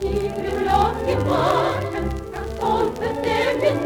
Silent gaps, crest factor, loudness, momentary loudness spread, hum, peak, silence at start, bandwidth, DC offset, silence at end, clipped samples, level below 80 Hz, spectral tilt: none; 16 dB; -22 LUFS; 7 LU; none; -6 dBFS; 0 s; 20 kHz; under 0.1%; 0 s; under 0.1%; -34 dBFS; -6 dB/octave